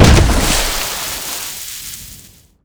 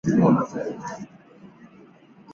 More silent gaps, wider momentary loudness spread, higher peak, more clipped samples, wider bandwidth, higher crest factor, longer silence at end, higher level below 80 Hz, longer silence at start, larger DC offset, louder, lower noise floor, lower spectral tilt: neither; second, 18 LU vs 21 LU; first, 0 dBFS vs -6 dBFS; first, 0.5% vs under 0.1%; first, over 20 kHz vs 7.6 kHz; second, 14 dB vs 20 dB; first, 0.45 s vs 0 s; first, -20 dBFS vs -58 dBFS; about the same, 0 s vs 0.05 s; neither; first, -16 LUFS vs -23 LUFS; second, -42 dBFS vs -51 dBFS; second, -4 dB/octave vs -8.5 dB/octave